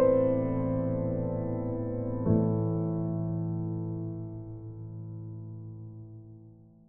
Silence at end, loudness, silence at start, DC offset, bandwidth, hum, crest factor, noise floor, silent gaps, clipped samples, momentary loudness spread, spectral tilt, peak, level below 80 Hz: 0.2 s; -31 LUFS; 0 s; under 0.1%; 2.8 kHz; none; 18 dB; -53 dBFS; none; under 0.1%; 17 LU; -12.5 dB/octave; -12 dBFS; -52 dBFS